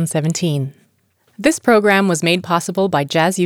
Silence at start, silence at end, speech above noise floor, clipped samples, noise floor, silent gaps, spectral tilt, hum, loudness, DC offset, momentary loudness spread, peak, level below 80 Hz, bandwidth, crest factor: 0 s; 0 s; 44 dB; under 0.1%; -60 dBFS; none; -5 dB/octave; none; -16 LUFS; under 0.1%; 7 LU; -2 dBFS; -62 dBFS; 19 kHz; 14 dB